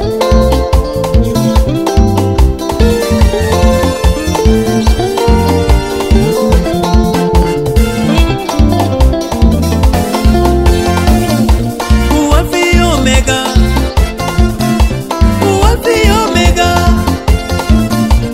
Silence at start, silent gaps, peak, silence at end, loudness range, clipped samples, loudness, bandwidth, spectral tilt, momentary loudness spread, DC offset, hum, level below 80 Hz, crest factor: 0 s; none; 0 dBFS; 0 s; 1 LU; 0.4%; -11 LUFS; 16 kHz; -6 dB/octave; 3 LU; under 0.1%; none; -12 dBFS; 10 dB